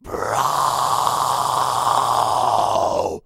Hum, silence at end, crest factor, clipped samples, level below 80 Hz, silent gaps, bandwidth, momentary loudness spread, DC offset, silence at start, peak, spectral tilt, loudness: none; 0.05 s; 16 dB; under 0.1%; -50 dBFS; none; 16 kHz; 2 LU; under 0.1%; 0.05 s; -2 dBFS; -2.5 dB/octave; -19 LUFS